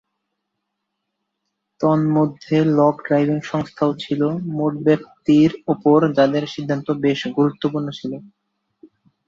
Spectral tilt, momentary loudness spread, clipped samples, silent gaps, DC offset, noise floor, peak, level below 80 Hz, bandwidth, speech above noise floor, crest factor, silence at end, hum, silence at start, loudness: -8 dB/octave; 9 LU; under 0.1%; none; under 0.1%; -77 dBFS; -2 dBFS; -60 dBFS; 7.4 kHz; 59 dB; 16 dB; 1 s; none; 1.8 s; -19 LUFS